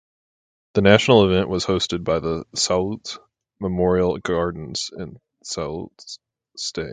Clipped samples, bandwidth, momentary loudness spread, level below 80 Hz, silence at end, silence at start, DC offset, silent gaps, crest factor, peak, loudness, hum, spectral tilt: under 0.1%; 9.6 kHz; 21 LU; -44 dBFS; 0 s; 0.75 s; under 0.1%; none; 22 dB; 0 dBFS; -21 LUFS; none; -4.5 dB/octave